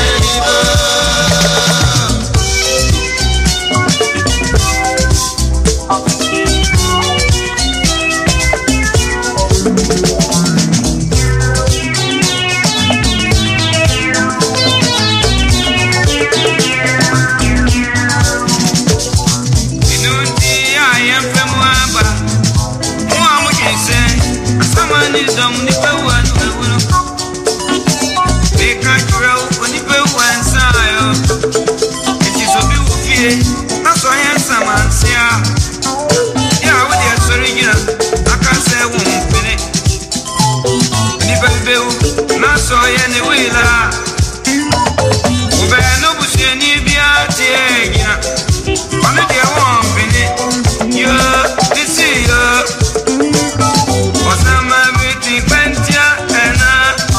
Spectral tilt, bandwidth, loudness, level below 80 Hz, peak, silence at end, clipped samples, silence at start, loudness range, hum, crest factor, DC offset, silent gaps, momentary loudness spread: -3.5 dB/octave; 15.5 kHz; -11 LUFS; -20 dBFS; 0 dBFS; 0 s; under 0.1%; 0 s; 2 LU; none; 12 dB; under 0.1%; none; 4 LU